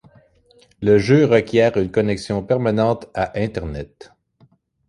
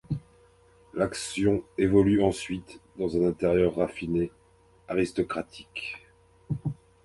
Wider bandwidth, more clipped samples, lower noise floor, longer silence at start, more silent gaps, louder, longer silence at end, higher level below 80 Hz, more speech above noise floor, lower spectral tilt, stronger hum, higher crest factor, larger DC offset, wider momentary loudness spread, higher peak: about the same, 11 kHz vs 11.5 kHz; neither; about the same, -56 dBFS vs -59 dBFS; first, 0.8 s vs 0.1 s; neither; first, -18 LUFS vs -28 LUFS; first, 1.05 s vs 0.3 s; first, -44 dBFS vs -50 dBFS; first, 39 dB vs 32 dB; about the same, -7 dB/octave vs -6.5 dB/octave; neither; about the same, 18 dB vs 20 dB; neither; about the same, 13 LU vs 14 LU; first, -2 dBFS vs -8 dBFS